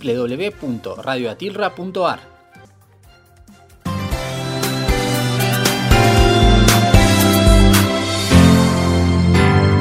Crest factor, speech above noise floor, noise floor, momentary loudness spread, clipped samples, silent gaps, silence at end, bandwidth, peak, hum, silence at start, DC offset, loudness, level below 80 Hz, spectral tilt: 14 dB; 26 dB; -48 dBFS; 12 LU; under 0.1%; none; 0 s; 16 kHz; 0 dBFS; none; 0 s; under 0.1%; -15 LUFS; -24 dBFS; -5 dB/octave